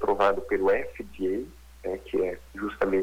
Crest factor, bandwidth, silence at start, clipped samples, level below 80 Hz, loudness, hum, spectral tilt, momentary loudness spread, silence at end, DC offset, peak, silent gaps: 18 dB; 19 kHz; 0 s; under 0.1%; -50 dBFS; -28 LUFS; none; -6.5 dB/octave; 12 LU; 0 s; under 0.1%; -10 dBFS; none